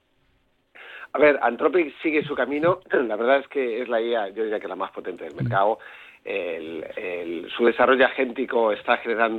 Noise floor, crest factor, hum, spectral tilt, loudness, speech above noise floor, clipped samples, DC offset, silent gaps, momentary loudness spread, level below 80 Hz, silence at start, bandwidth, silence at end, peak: -66 dBFS; 18 dB; none; -7.5 dB/octave; -23 LUFS; 43 dB; under 0.1%; under 0.1%; none; 13 LU; -64 dBFS; 0.75 s; 4.5 kHz; 0 s; -6 dBFS